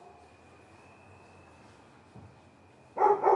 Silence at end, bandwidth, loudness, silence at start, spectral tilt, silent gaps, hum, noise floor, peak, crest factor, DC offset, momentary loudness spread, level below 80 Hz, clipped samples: 0 s; 10.5 kHz; -28 LUFS; 2.15 s; -7 dB/octave; none; none; -58 dBFS; -10 dBFS; 22 dB; under 0.1%; 29 LU; -76 dBFS; under 0.1%